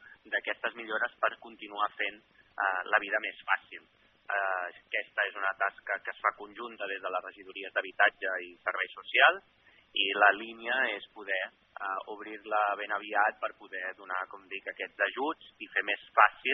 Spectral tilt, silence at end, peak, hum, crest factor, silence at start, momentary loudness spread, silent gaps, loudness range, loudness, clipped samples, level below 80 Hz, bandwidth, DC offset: 3 dB/octave; 0 s; -6 dBFS; none; 26 dB; 0.05 s; 15 LU; none; 5 LU; -31 LUFS; under 0.1%; -80 dBFS; 4.1 kHz; under 0.1%